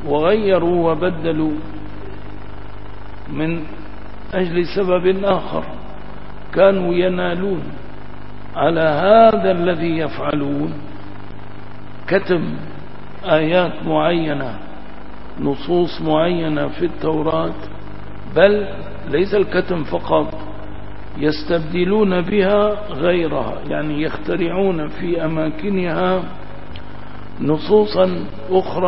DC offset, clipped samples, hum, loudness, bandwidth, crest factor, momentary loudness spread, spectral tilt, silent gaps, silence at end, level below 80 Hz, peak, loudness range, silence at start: 6%; under 0.1%; 50 Hz at -40 dBFS; -18 LUFS; 5.8 kHz; 20 dB; 21 LU; -11 dB/octave; none; 0 s; -40 dBFS; 0 dBFS; 5 LU; 0 s